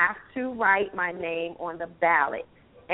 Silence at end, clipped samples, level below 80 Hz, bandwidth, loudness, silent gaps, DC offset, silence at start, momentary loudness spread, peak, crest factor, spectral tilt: 0 s; under 0.1%; -62 dBFS; 4 kHz; -26 LUFS; none; under 0.1%; 0 s; 12 LU; -8 dBFS; 20 dB; -2 dB/octave